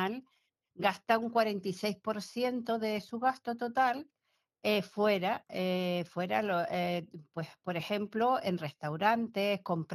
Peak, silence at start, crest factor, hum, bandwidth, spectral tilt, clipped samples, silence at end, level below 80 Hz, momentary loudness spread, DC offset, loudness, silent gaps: -12 dBFS; 0 s; 20 dB; none; 16 kHz; -6 dB/octave; under 0.1%; 0 s; -80 dBFS; 8 LU; under 0.1%; -33 LUFS; none